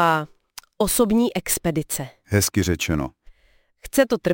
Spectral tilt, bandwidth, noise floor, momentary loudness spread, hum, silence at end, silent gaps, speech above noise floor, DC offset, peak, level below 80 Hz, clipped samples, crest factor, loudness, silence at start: -4.5 dB/octave; 17 kHz; -60 dBFS; 13 LU; none; 0 s; none; 39 dB; under 0.1%; -2 dBFS; -42 dBFS; under 0.1%; 20 dB; -22 LUFS; 0 s